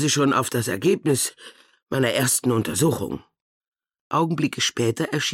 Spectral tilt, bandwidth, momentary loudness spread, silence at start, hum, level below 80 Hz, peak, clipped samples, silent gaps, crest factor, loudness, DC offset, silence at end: -4 dB/octave; 17 kHz; 7 LU; 0 s; none; -58 dBFS; -10 dBFS; under 0.1%; 1.82-1.87 s, 3.42-3.60 s, 3.68-3.72 s, 4.01-4.10 s; 14 dB; -22 LUFS; under 0.1%; 0 s